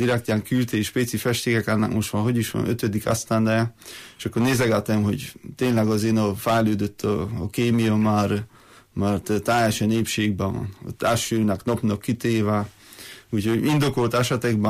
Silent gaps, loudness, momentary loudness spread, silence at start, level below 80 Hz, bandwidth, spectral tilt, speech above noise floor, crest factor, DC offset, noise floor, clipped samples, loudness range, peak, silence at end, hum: none; -23 LUFS; 9 LU; 0 s; -52 dBFS; 15.5 kHz; -5.5 dB/octave; 21 dB; 12 dB; under 0.1%; -43 dBFS; under 0.1%; 1 LU; -10 dBFS; 0 s; none